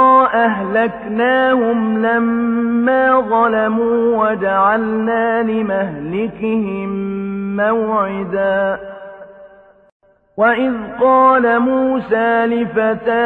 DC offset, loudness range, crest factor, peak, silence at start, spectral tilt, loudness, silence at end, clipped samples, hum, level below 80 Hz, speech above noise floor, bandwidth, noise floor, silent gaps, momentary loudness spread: under 0.1%; 5 LU; 14 dB; -2 dBFS; 0 s; -9 dB/octave; -15 LUFS; 0 s; under 0.1%; none; -52 dBFS; 28 dB; 4.2 kHz; -43 dBFS; 9.92-10.00 s; 9 LU